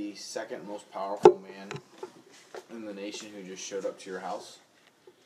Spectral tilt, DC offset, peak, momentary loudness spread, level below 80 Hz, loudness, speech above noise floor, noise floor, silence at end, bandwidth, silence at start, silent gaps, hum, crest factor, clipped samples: -4.5 dB/octave; under 0.1%; 0 dBFS; 25 LU; -86 dBFS; -30 LUFS; 29 dB; -59 dBFS; 0.15 s; 12.5 kHz; 0 s; none; none; 32 dB; under 0.1%